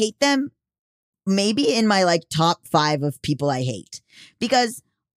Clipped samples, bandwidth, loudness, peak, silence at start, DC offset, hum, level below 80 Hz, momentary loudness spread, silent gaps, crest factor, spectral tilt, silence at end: under 0.1%; 15.5 kHz; -21 LUFS; -6 dBFS; 0 s; under 0.1%; none; -58 dBFS; 14 LU; 0.79-1.13 s; 16 dB; -4.5 dB/octave; 0.35 s